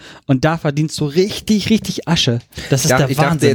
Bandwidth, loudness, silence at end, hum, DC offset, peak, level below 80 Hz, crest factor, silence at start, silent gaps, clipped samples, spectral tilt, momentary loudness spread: 20 kHz; -16 LUFS; 0 s; none; under 0.1%; -2 dBFS; -42 dBFS; 14 dB; 0 s; none; under 0.1%; -5 dB/octave; 5 LU